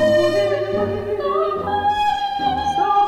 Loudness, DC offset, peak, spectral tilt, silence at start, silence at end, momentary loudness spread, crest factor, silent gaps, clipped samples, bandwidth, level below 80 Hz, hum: -20 LUFS; under 0.1%; -6 dBFS; -5.5 dB/octave; 0 s; 0 s; 5 LU; 12 dB; none; under 0.1%; 14.5 kHz; -46 dBFS; none